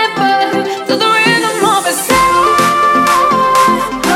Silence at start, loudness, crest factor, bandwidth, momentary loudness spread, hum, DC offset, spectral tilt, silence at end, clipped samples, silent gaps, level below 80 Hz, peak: 0 s; -10 LUFS; 10 dB; 16.5 kHz; 4 LU; none; under 0.1%; -3 dB/octave; 0 s; under 0.1%; none; -40 dBFS; 0 dBFS